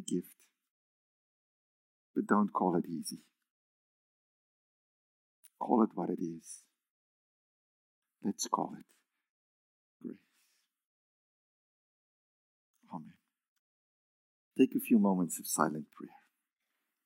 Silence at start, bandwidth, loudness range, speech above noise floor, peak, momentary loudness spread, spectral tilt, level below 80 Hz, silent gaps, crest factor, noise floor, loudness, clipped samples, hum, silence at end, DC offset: 0 s; 16 kHz; 24 LU; 53 dB; -12 dBFS; 21 LU; -5.5 dB/octave; -90 dBFS; 0.70-2.14 s, 3.50-5.43 s, 6.90-8.02 s, 9.30-10.00 s, 10.86-12.74 s, 13.48-14.51 s; 26 dB; -86 dBFS; -33 LUFS; under 0.1%; none; 0.95 s; under 0.1%